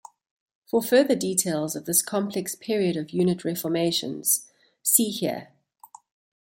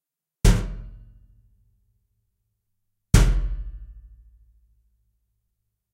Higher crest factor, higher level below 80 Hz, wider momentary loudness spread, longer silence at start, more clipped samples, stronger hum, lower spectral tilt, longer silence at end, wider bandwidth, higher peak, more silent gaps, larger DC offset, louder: about the same, 22 dB vs 26 dB; second, -70 dBFS vs -28 dBFS; second, 8 LU vs 22 LU; first, 0.75 s vs 0.45 s; neither; neither; second, -3.5 dB/octave vs -5.5 dB/octave; second, 0.95 s vs 1.95 s; about the same, 17 kHz vs 15.5 kHz; second, -4 dBFS vs 0 dBFS; neither; neither; about the same, -24 LUFS vs -23 LUFS